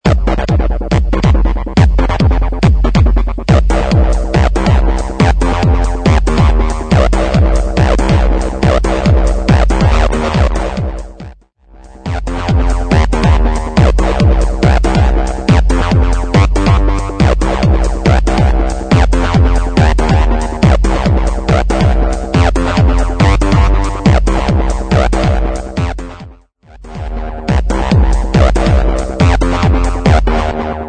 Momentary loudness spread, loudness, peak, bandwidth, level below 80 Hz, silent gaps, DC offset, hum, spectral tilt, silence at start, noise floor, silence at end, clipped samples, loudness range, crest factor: 5 LU; -12 LUFS; 0 dBFS; 9.4 kHz; -12 dBFS; none; under 0.1%; none; -7 dB/octave; 0.05 s; -40 dBFS; 0 s; 0.1%; 4 LU; 10 dB